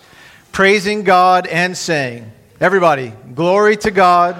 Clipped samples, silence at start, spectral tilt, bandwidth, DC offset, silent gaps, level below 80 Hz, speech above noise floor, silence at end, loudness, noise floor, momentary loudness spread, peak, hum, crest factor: under 0.1%; 0.55 s; -4.5 dB/octave; 15 kHz; under 0.1%; none; -50 dBFS; 30 dB; 0 s; -13 LUFS; -43 dBFS; 11 LU; 0 dBFS; none; 14 dB